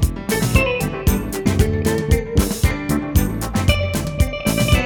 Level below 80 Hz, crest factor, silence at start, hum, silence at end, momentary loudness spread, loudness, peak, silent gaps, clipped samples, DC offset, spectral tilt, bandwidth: -24 dBFS; 16 dB; 0 s; none; 0 s; 4 LU; -19 LUFS; -2 dBFS; none; under 0.1%; under 0.1%; -5.5 dB/octave; over 20 kHz